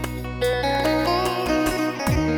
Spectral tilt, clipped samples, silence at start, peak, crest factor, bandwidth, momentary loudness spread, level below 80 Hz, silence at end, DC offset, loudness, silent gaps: -5.5 dB/octave; under 0.1%; 0 s; -10 dBFS; 12 dB; 19 kHz; 3 LU; -34 dBFS; 0 s; under 0.1%; -22 LUFS; none